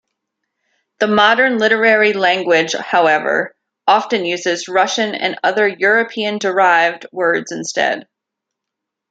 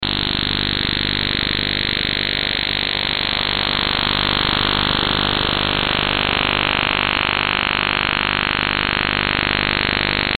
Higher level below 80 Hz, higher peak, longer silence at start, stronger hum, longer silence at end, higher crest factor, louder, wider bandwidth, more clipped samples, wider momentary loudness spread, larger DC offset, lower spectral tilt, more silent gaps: second, -66 dBFS vs -34 dBFS; first, 0 dBFS vs -6 dBFS; first, 1 s vs 0 s; neither; first, 1.1 s vs 0 s; about the same, 16 dB vs 14 dB; about the same, -15 LUFS vs -17 LUFS; second, 9 kHz vs 17.5 kHz; neither; first, 8 LU vs 2 LU; neither; second, -3 dB/octave vs -5.5 dB/octave; neither